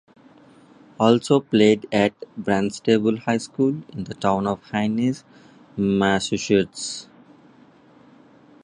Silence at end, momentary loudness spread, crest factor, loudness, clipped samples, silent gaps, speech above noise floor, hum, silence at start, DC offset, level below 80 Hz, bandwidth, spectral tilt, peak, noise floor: 1.6 s; 13 LU; 20 dB; -21 LUFS; under 0.1%; none; 31 dB; none; 1 s; under 0.1%; -56 dBFS; 11 kHz; -5.5 dB/octave; -2 dBFS; -52 dBFS